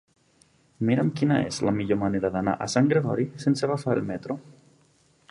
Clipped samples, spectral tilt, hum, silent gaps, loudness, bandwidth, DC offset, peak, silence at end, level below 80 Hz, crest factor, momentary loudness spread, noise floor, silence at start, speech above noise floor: under 0.1%; -6.5 dB/octave; none; none; -25 LUFS; 11.5 kHz; under 0.1%; -6 dBFS; 0.8 s; -56 dBFS; 20 dB; 8 LU; -62 dBFS; 0.8 s; 38 dB